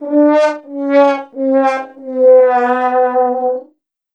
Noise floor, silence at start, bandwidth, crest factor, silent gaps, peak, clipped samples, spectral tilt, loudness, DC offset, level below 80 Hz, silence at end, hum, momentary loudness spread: -52 dBFS; 0 s; 7.6 kHz; 12 dB; none; 0 dBFS; under 0.1%; -4.5 dB/octave; -13 LUFS; under 0.1%; -84 dBFS; 0.5 s; none; 12 LU